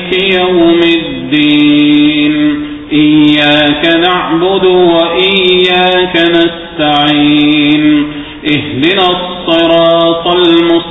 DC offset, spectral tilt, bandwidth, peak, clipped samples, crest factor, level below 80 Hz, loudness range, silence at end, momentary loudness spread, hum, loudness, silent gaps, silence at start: 0.3%; -7 dB/octave; 4.1 kHz; 0 dBFS; 0.3%; 8 dB; -38 dBFS; 2 LU; 0 s; 6 LU; none; -8 LUFS; none; 0 s